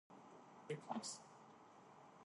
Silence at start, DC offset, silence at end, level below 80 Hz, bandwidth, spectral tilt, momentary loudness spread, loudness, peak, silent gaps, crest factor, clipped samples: 0.1 s; under 0.1%; 0 s; under -90 dBFS; 11.5 kHz; -3.5 dB/octave; 16 LU; -52 LUFS; -32 dBFS; none; 22 dB; under 0.1%